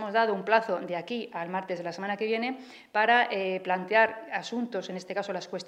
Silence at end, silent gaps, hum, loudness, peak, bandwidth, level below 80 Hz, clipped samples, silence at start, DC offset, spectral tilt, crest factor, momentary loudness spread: 0 s; none; none; -28 LUFS; -8 dBFS; 9.8 kHz; -82 dBFS; under 0.1%; 0 s; under 0.1%; -4.5 dB/octave; 20 dB; 11 LU